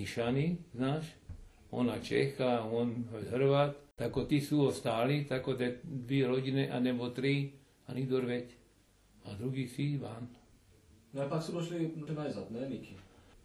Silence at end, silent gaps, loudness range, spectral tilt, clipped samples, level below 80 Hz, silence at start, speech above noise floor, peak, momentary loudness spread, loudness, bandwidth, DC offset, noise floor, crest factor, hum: 0.45 s; none; 8 LU; -7 dB/octave; under 0.1%; -62 dBFS; 0 s; 32 dB; -16 dBFS; 14 LU; -35 LUFS; 13 kHz; under 0.1%; -66 dBFS; 18 dB; none